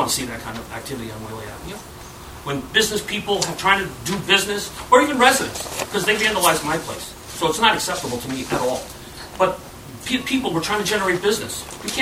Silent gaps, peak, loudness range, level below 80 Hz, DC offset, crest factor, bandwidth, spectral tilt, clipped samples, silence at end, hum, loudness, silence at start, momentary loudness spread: none; 0 dBFS; 6 LU; -46 dBFS; under 0.1%; 22 dB; over 20 kHz; -2.5 dB/octave; under 0.1%; 0 s; none; -20 LUFS; 0 s; 17 LU